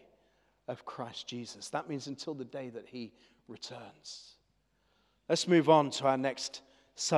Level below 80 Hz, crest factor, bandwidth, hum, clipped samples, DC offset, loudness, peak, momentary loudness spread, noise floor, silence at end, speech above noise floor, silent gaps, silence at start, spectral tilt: -80 dBFS; 24 dB; 12.5 kHz; none; under 0.1%; under 0.1%; -32 LUFS; -10 dBFS; 22 LU; -74 dBFS; 0 s; 41 dB; none; 0.7 s; -4.5 dB/octave